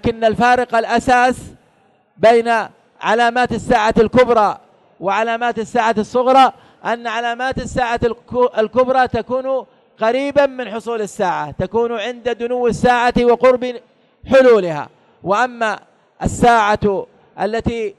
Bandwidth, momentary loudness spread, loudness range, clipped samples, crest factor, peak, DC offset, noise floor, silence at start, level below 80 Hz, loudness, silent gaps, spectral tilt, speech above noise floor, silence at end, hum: 12 kHz; 12 LU; 3 LU; under 0.1%; 14 dB; -2 dBFS; under 0.1%; -56 dBFS; 0.05 s; -40 dBFS; -16 LUFS; none; -5 dB/octave; 41 dB; 0.05 s; none